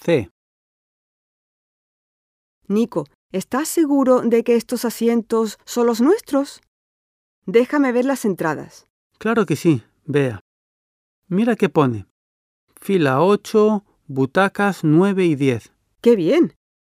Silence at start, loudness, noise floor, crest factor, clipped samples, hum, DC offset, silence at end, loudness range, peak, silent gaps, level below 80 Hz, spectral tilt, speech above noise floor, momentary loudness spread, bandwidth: 0.05 s; -19 LUFS; under -90 dBFS; 18 dB; under 0.1%; none; under 0.1%; 0.45 s; 5 LU; -2 dBFS; 0.31-2.61 s, 3.15-3.29 s, 6.68-7.42 s, 8.90-9.10 s, 10.41-11.22 s, 12.10-12.67 s; -64 dBFS; -6.5 dB/octave; over 72 dB; 11 LU; 15.5 kHz